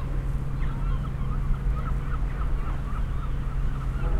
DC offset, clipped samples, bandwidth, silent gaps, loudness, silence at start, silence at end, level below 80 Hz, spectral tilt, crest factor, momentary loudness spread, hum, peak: under 0.1%; under 0.1%; 4.8 kHz; none; -31 LUFS; 0 s; 0 s; -28 dBFS; -8 dB/octave; 14 dB; 2 LU; none; -12 dBFS